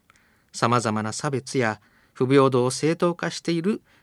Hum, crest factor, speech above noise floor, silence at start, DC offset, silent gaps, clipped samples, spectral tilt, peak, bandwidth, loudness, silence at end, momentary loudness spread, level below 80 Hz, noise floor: none; 20 dB; 37 dB; 0.55 s; under 0.1%; none; under 0.1%; -5.5 dB/octave; -4 dBFS; 13 kHz; -23 LUFS; 0.25 s; 9 LU; -70 dBFS; -60 dBFS